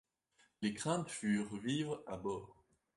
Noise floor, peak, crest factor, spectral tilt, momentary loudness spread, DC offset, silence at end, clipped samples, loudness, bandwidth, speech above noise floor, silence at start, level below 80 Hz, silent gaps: -75 dBFS; -22 dBFS; 18 dB; -5 dB/octave; 6 LU; under 0.1%; 0.45 s; under 0.1%; -40 LUFS; 11.5 kHz; 36 dB; 0.6 s; -70 dBFS; none